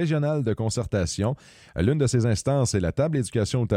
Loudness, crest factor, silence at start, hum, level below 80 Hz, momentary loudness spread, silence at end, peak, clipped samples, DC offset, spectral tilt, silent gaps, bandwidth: -24 LUFS; 14 dB; 0 s; none; -44 dBFS; 5 LU; 0 s; -10 dBFS; under 0.1%; under 0.1%; -6 dB/octave; none; 12.5 kHz